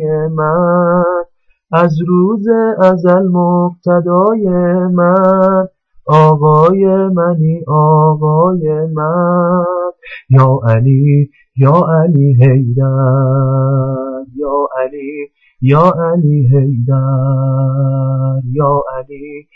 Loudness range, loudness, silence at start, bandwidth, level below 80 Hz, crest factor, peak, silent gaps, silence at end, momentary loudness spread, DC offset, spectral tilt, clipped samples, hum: 3 LU; -11 LUFS; 0 s; 4.2 kHz; -46 dBFS; 10 dB; 0 dBFS; none; 0.15 s; 10 LU; under 0.1%; -11 dB/octave; under 0.1%; none